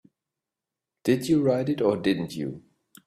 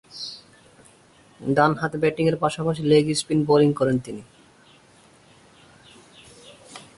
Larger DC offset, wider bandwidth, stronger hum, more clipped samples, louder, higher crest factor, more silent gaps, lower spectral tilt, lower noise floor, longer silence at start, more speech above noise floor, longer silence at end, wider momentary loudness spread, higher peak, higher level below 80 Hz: neither; first, 15 kHz vs 11.5 kHz; neither; neither; second, -25 LUFS vs -21 LUFS; about the same, 18 dB vs 20 dB; neither; about the same, -6.5 dB/octave vs -6 dB/octave; first, -88 dBFS vs -54 dBFS; first, 1.05 s vs 0.15 s; first, 64 dB vs 33 dB; first, 0.45 s vs 0.15 s; second, 12 LU vs 20 LU; second, -8 dBFS vs -4 dBFS; about the same, -62 dBFS vs -58 dBFS